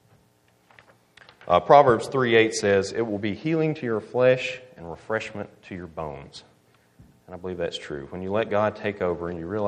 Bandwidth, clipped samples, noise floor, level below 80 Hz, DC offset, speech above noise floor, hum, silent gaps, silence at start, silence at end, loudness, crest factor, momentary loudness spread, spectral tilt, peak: 11 kHz; under 0.1%; -62 dBFS; -58 dBFS; under 0.1%; 38 dB; none; none; 1.45 s; 0 s; -23 LUFS; 24 dB; 19 LU; -5.5 dB/octave; -2 dBFS